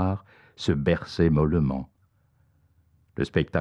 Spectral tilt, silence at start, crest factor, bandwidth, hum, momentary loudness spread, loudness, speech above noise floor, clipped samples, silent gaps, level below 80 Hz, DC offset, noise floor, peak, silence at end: -8 dB/octave; 0 s; 18 dB; 9.4 kHz; none; 13 LU; -26 LUFS; 41 dB; under 0.1%; none; -44 dBFS; under 0.1%; -65 dBFS; -10 dBFS; 0 s